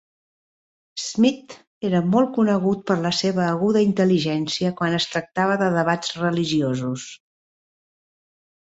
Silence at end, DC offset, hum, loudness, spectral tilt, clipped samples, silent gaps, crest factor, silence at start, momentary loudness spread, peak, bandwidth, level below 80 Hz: 1.5 s; under 0.1%; none; -21 LUFS; -5.5 dB/octave; under 0.1%; 1.67-1.81 s; 18 dB; 0.95 s; 10 LU; -4 dBFS; 8 kHz; -62 dBFS